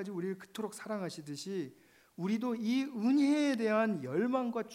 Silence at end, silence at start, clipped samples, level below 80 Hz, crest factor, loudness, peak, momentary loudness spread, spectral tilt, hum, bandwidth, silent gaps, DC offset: 0 s; 0 s; under 0.1%; -84 dBFS; 16 dB; -34 LUFS; -18 dBFS; 12 LU; -6 dB/octave; none; 15.5 kHz; none; under 0.1%